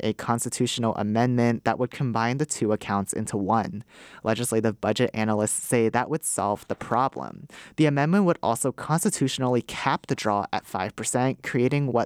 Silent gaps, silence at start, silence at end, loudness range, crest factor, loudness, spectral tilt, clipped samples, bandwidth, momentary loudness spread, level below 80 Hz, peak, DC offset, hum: none; 0 s; 0 s; 2 LU; 18 dB; -25 LUFS; -5 dB/octave; under 0.1%; 18.5 kHz; 6 LU; -62 dBFS; -8 dBFS; under 0.1%; none